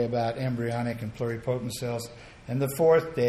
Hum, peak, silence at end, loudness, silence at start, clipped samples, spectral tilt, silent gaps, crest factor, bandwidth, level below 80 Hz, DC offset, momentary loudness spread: none; -10 dBFS; 0 s; -28 LUFS; 0 s; under 0.1%; -6.5 dB/octave; none; 16 dB; 14.5 kHz; -56 dBFS; under 0.1%; 12 LU